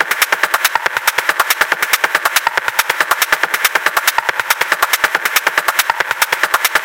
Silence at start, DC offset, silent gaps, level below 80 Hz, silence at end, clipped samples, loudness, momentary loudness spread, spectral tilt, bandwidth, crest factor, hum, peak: 0 s; under 0.1%; none; -54 dBFS; 0 s; 0.2%; -13 LUFS; 2 LU; 1 dB/octave; over 20 kHz; 16 dB; none; 0 dBFS